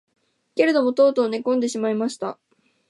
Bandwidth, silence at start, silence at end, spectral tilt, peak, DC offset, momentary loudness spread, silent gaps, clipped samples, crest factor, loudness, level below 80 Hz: 11.5 kHz; 0.55 s; 0.55 s; -4.5 dB/octave; -4 dBFS; under 0.1%; 13 LU; none; under 0.1%; 18 dB; -21 LUFS; -80 dBFS